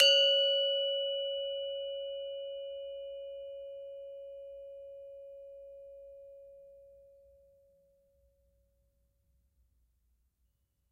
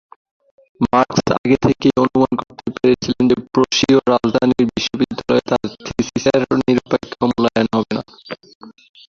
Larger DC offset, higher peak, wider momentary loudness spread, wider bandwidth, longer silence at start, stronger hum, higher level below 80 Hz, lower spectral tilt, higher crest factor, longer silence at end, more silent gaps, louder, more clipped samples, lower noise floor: neither; second, -12 dBFS vs 0 dBFS; first, 25 LU vs 10 LU; first, 12 kHz vs 7.4 kHz; second, 0 s vs 0.8 s; neither; second, -76 dBFS vs -46 dBFS; second, 2 dB/octave vs -5.5 dB/octave; first, 26 dB vs 16 dB; first, 3.9 s vs 0.35 s; second, none vs 1.38-1.44 s, 8.55-8.61 s; second, -31 LUFS vs -17 LUFS; neither; first, -78 dBFS vs -35 dBFS